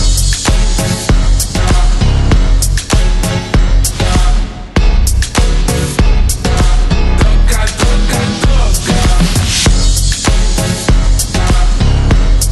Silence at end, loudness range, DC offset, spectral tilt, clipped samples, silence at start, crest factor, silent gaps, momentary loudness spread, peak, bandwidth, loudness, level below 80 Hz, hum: 0 s; 1 LU; under 0.1%; -4 dB/octave; under 0.1%; 0 s; 8 dB; none; 2 LU; 0 dBFS; 13 kHz; -12 LUFS; -10 dBFS; none